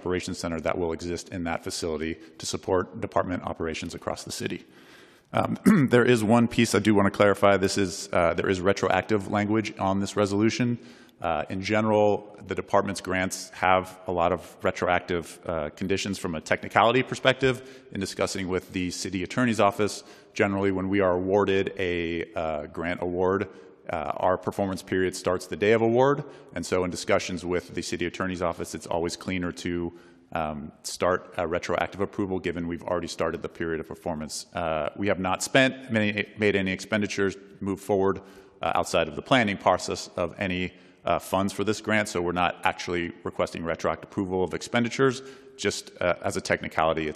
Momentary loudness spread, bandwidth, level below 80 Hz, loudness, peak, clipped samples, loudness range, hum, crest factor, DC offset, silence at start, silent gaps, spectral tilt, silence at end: 11 LU; 14 kHz; -58 dBFS; -26 LUFS; -2 dBFS; under 0.1%; 7 LU; none; 24 dB; under 0.1%; 0 s; none; -5 dB/octave; 0 s